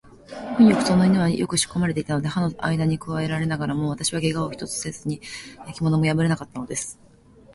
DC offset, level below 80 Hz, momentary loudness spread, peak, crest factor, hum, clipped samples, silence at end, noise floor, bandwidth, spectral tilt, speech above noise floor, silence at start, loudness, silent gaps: under 0.1%; -50 dBFS; 14 LU; -4 dBFS; 18 dB; none; under 0.1%; 0.6 s; -51 dBFS; 11.5 kHz; -5.5 dB/octave; 29 dB; 0.05 s; -23 LUFS; none